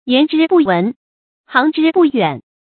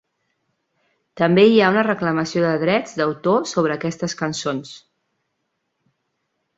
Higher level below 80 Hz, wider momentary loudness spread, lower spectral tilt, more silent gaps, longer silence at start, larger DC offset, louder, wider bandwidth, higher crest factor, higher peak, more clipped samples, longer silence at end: about the same, -60 dBFS vs -62 dBFS; second, 6 LU vs 12 LU; first, -9.5 dB/octave vs -5.5 dB/octave; first, 0.96-1.44 s vs none; second, 0.05 s vs 1.15 s; neither; first, -14 LUFS vs -19 LUFS; second, 4.5 kHz vs 8 kHz; second, 14 dB vs 20 dB; about the same, 0 dBFS vs -2 dBFS; neither; second, 0.3 s vs 1.8 s